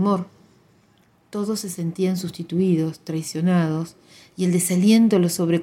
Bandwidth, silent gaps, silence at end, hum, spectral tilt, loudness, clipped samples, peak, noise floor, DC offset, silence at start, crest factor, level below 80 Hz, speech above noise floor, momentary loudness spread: 17 kHz; none; 0 s; none; -6 dB/octave; -21 LUFS; under 0.1%; -6 dBFS; -58 dBFS; under 0.1%; 0 s; 16 dB; -66 dBFS; 38 dB; 13 LU